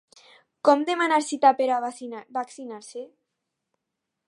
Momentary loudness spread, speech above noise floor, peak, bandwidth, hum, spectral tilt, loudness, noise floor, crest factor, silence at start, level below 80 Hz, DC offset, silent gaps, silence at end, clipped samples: 18 LU; 59 dB; -4 dBFS; 11.5 kHz; none; -2.5 dB/octave; -23 LUFS; -83 dBFS; 22 dB; 0.65 s; -86 dBFS; under 0.1%; none; 1.2 s; under 0.1%